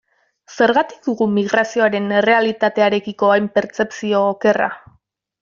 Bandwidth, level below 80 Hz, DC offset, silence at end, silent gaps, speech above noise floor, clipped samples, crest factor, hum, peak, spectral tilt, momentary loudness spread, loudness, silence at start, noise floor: 7.4 kHz; -62 dBFS; under 0.1%; 0.65 s; none; 32 dB; under 0.1%; 16 dB; none; -2 dBFS; -5.5 dB/octave; 6 LU; -17 LUFS; 0.5 s; -48 dBFS